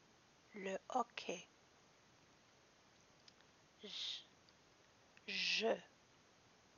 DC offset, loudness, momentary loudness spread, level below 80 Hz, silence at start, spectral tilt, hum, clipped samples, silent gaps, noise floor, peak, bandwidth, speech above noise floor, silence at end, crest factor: under 0.1%; -43 LUFS; 28 LU; -90 dBFS; 0.5 s; -0.5 dB/octave; none; under 0.1%; none; -70 dBFS; -24 dBFS; 7.2 kHz; 27 dB; 0.9 s; 24 dB